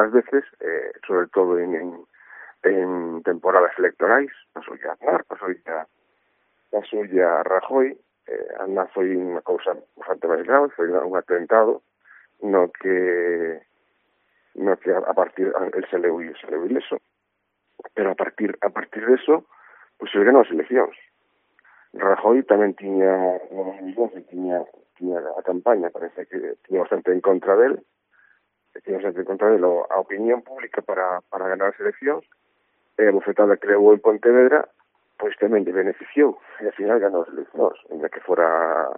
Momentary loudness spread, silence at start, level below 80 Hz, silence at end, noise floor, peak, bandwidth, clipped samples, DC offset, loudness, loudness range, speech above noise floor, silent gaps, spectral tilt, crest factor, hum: 13 LU; 0 s; -76 dBFS; 0 s; -75 dBFS; 0 dBFS; 3.7 kHz; under 0.1%; under 0.1%; -21 LUFS; 6 LU; 54 dB; none; -4 dB/octave; 22 dB; none